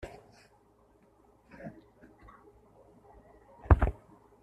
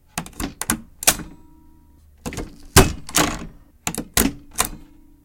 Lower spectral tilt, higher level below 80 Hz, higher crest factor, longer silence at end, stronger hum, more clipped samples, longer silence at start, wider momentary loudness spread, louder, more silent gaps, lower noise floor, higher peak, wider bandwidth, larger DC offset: first, -9.5 dB/octave vs -3 dB/octave; about the same, -38 dBFS vs -34 dBFS; first, 32 dB vs 24 dB; about the same, 0.5 s vs 0.4 s; neither; neither; about the same, 0.05 s vs 0.15 s; first, 30 LU vs 18 LU; second, -28 LUFS vs -20 LUFS; neither; first, -64 dBFS vs -50 dBFS; second, -4 dBFS vs 0 dBFS; second, 5.6 kHz vs 17 kHz; neither